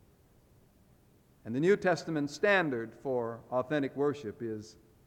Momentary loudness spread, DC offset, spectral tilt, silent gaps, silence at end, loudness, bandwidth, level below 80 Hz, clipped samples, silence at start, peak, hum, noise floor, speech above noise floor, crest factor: 13 LU; under 0.1%; -6 dB/octave; none; 0.35 s; -32 LUFS; 14.5 kHz; -70 dBFS; under 0.1%; 1.45 s; -14 dBFS; none; -64 dBFS; 32 dB; 20 dB